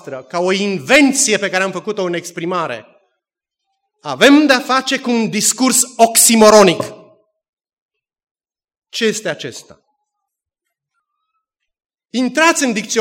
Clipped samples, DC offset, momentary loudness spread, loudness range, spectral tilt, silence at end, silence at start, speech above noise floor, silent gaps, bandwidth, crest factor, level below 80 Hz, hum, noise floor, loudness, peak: 0.1%; under 0.1%; 16 LU; 15 LU; -2.5 dB/octave; 0 s; 0.05 s; 66 dB; 7.49-7.53 s, 7.73-7.89 s, 8.31-8.35 s; 17 kHz; 16 dB; -58 dBFS; none; -79 dBFS; -13 LUFS; 0 dBFS